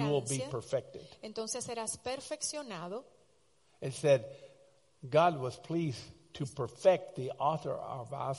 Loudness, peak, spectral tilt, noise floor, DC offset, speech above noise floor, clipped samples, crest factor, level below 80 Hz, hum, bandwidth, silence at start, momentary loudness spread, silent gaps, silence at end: -34 LUFS; -14 dBFS; -5 dB/octave; -71 dBFS; under 0.1%; 36 dB; under 0.1%; 20 dB; -70 dBFS; none; 11.5 kHz; 0 s; 17 LU; none; 0 s